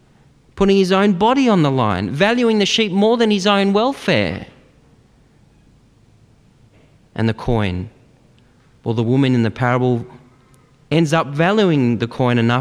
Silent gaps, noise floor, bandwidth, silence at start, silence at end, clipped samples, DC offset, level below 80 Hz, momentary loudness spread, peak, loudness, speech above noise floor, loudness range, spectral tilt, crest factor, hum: none; -52 dBFS; 11 kHz; 0.55 s; 0 s; under 0.1%; under 0.1%; -44 dBFS; 9 LU; -2 dBFS; -16 LUFS; 36 dB; 11 LU; -6 dB/octave; 16 dB; none